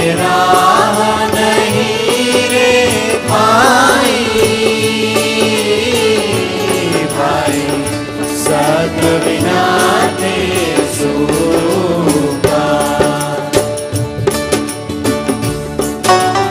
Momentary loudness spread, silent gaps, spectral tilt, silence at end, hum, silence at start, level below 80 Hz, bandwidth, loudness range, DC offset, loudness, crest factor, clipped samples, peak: 7 LU; none; -4 dB/octave; 0 s; none; 0 s; -38 dBFS; 15.5 kHz; 4 LU; under 0.1%; -12 LUFS; 12 dB; under 0.1%; 0 dBFS